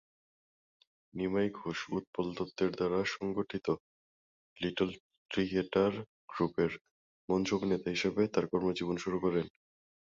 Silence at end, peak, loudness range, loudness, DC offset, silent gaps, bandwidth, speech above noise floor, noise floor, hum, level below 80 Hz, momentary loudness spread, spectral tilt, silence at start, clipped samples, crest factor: 0.7 s; -16 dBFS; 3 LU; -34 LUFS; under 0.1%; 2.07-2.13 s, 3.80-4.56 s, 5.00-5.10 s, 5.18-5.26 s, 6.08-6.28 s, 6.81-6.85 s, 6.91-7.28 s; 7.6 kHz; over 57 dB; under -90 dBFS; none; -64 dBFS; 8 LU; -6 dB/octave; 1.15 s; under 0.1%; 20 dB